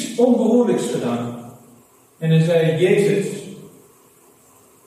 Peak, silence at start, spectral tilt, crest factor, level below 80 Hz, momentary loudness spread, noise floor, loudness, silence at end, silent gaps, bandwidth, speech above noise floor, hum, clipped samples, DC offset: -4 dBFS; 0 s; -6.5 dB/octave; 16 dB; -68 dBFS; 15 LU; -52 dBFS; -18 LUFS; 1.2 s; none; 13.5 kHz; 35 dB; none; under 0.1%; under 0.1%